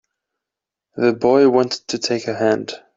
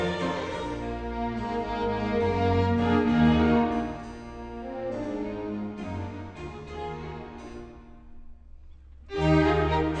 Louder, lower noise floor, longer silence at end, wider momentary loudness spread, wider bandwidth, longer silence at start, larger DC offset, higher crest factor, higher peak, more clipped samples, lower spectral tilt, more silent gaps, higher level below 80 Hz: first, -18 LUFS vs -27 LUFS; first, -86 dBFS vs -47 dBFS; first, 0.2 s vs 0 s; second, 9 LU vs 18 LU; second, 7.8 kHz vs 8.8 kHz; first, 0.95 s vs 0 s; neither; about the same, 16 dB vs 18 dB; first, -2 dBFS vs -10 dBFS; neither; second, -4.5 dB/octave vs -7.5 dB/octave; neither; second, -62 dBFS vs -40 dBFS